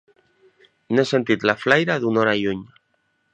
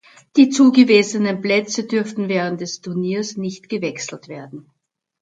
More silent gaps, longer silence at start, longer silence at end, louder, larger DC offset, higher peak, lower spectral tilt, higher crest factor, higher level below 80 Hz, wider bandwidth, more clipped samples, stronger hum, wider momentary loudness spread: neither; first, 0.9 s vs 0.35 s; about the same, 0.65 s vs 0.6 s; about the same, -20 LUFS vs -18 LUFS; neither; about the same, 0 dBFS vs 0 dBFS; about the same, -5.5 dB/octave vs -5 dB/octave; about the same, 22 dB vs 18 dB; first, -60 dBFS vs -68 dBFS; about the same, 8.8 kHz vs 9 kHz; neither; neither; second, 6 LU vs 17 LU